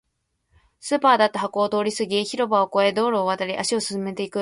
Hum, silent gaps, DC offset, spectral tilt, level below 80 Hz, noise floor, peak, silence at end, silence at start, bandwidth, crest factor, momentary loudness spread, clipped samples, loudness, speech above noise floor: none; none; under 0.1%; -3.5 dB/octave; -66 dBFS; -73 dBFS; -4 dBFS; 0 s; 0.85 s; 11.5 kHz; 18 dB; 8 LU; under 0.1%; -22 LUFS; 51 dB